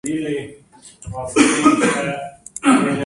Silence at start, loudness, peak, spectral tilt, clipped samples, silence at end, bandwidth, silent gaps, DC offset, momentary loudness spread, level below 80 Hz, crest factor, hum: 0.05 s; -17 LUFS; 0 dBFS; -4 dB/octave; under 0.1%; 0 s; 11.5 kHz; none; under 0.1%; 19 LU; -50 dBFS; 18 dB; none